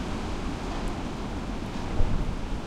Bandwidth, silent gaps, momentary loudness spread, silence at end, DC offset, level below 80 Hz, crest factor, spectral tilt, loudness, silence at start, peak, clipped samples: 11 kHz; none; 4 LU; 0 s; under 0.1%; -32 dBFS; 18 dB; -6 dB/octave; -33 LUFS; 0 s; -10 dBFS; under 0.1%